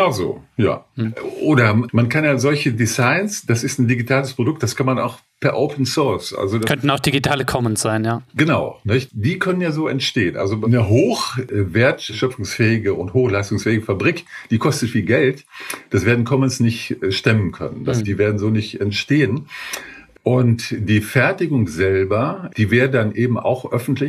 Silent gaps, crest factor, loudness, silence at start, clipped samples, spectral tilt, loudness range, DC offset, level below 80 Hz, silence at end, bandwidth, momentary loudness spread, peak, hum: none; 18 dB; -18 LUFS; 0 s; under 0.1%; -5.5 dB/octave; 2 LU; under 0.1%; -50 dBFS; 0 s; 14.5 kHz; 7 LU; 0 dBFS; none